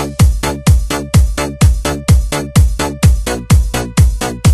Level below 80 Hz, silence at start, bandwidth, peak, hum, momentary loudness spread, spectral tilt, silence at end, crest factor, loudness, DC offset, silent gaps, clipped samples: -14 dBFS; 0 s; 13.5 kHz; 0 dBFS; none; 3 LU; -5.5 dB/octave; 0 s; 12 dB; -13 LUFS; under 0.1%; none; under 0.1%